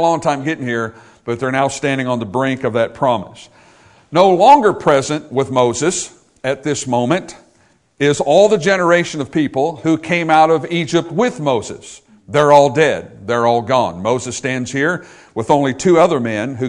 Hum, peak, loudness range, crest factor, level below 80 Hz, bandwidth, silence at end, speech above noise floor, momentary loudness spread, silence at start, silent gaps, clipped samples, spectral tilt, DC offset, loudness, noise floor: none; 0 dBFS; 4 LU; 16 dB; -54 dBFS; 11 kHz; 0 s; 40 dB; 11 LU; 0 s; none; 0.2%; -5 dB/octave; under 0.1%; -15 LUFS; -55 dBFS